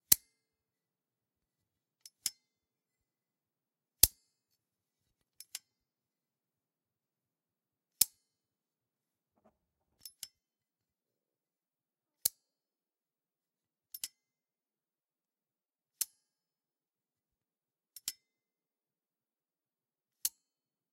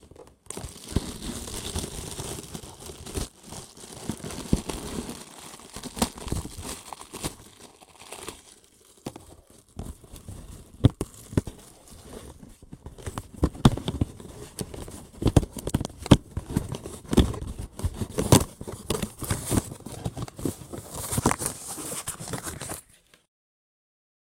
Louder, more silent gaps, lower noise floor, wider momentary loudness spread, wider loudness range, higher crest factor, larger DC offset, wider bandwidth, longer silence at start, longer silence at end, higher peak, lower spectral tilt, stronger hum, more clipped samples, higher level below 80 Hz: second, -33 LUFS vs -29 LUFS; neither; first, under -90 dBFS vs -56 dBFS; about the same, 22 LU vs 21 LU; first, 21 LU vs 10 LU; first, 40 dB vs 30 dB; neither; about the same, 16 kHz vs 17 kHz; about the same, 0.1 s vs 0.05 s; second, 0.65 s vs 1.45 s; about the same, -2 dBFS vs 0 dBFS; second, 0.5 dB/octave vs -5 dB/octave; neither; neither; second, -64 dBFS vs -40 dBFS